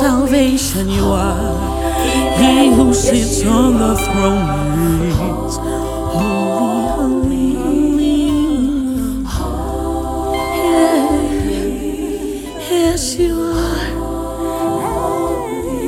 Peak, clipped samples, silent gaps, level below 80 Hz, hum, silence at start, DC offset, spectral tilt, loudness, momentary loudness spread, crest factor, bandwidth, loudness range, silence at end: 0 dBFS; under 0.1%; none; -26 dBFS; none; 0 s; under 0.1%; -5 dB/octave; -16 LUFS; 9 LU; 14 dB; 17.5 kHz; 5 LU; 0 s